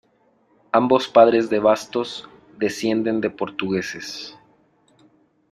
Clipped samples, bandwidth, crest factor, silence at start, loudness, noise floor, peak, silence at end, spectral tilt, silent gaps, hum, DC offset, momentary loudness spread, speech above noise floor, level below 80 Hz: under 0.1%; 14.5 kHz; 20 dB; 0.75 s; -20 LUFS; -61 dBFS; -2 dBFS; 1.2 s; -5 dB/octave; none; none; under 0.1%; 17 LU; 41 dB; -62 dBFS